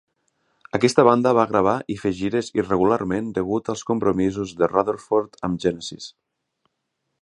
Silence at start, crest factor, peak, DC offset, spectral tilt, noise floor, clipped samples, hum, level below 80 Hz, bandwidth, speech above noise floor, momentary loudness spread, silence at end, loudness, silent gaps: 0.75 s; 22 dB; 0 dBFS; under 0.1%; -6 dB/octave; -77 dBFS; under 0.1%; none; -52 dBFS; 11.5 kHz; 56 dB; 11 LU; 1.1 s; -21 LUFS; none